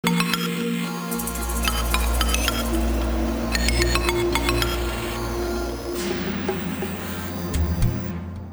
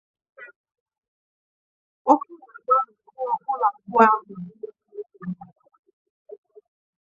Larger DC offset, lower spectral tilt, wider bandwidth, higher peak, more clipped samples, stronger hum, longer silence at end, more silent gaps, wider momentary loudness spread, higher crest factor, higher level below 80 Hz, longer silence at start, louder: neither; second, -4.5 dB/octave vs -7.5 dB/octave; first, over 20 kHz vs 7.6 kHz; about the same, -4 dBFS vs -2 dBFS; neither; neither; second, 0 s vs 1.75 s; second, none vs 0.56-0.64 s, 0.80-0.86 s, 0.98-1.02 s, 1.08-2.05 s; second, 7 LU vs 22 LU; second, 20 dB vs 26 dB; first, -28 dBFS vs -76 dBFS; second, 0.05 s vs 0.4 s; about the same, -24 LUFS vs -22 LUFS